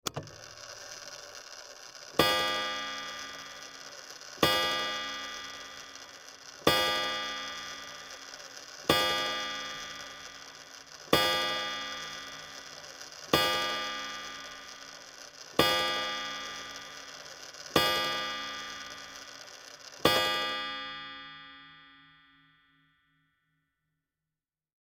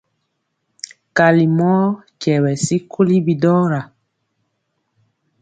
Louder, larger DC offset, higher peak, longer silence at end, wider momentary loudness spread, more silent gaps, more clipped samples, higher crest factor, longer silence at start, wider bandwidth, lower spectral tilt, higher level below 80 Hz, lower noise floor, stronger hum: second, -30 LUFS vs -16 LUFS; neither; second, -6 dBFS vs 0 dBFS; first, 2.85 s vs 1.55 s; first, 20 LU vs 11 LU; neither; neither; first, 28 dB vs 18 dB; second, 0.05 s vs 1.15 s; first, 17 kHz vs 9.4 kHz; second, -2 dB/octave vs -6.5 dB/octave; about the same, -62 dBFS vs -60 dBFS; first, under -90 dBFS vs -72 dBFS; neither